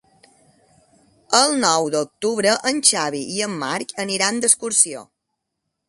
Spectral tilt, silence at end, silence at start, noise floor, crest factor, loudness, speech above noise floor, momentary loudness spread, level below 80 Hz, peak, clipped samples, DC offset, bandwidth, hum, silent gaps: -1.5 dB/octave; 0.85 s; 1.3 s; -78 dBFS; 22 dB; -18 LUFS; 58 dB; 9 LU; -68 dBFS; 0 dBFS; under 0.1%; under 0.1%; 12 kHz; none; none